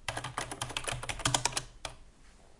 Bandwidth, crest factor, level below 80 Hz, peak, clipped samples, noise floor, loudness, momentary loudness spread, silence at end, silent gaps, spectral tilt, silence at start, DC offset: 11.5 kHz; 30 dB; -50 dBFS; -8 dBFS; under 0.1%; -56 dBFS; -34 LUFS; 15 LU; 0.05 s; none; -2 dB/octave; 0 s; under 0.1%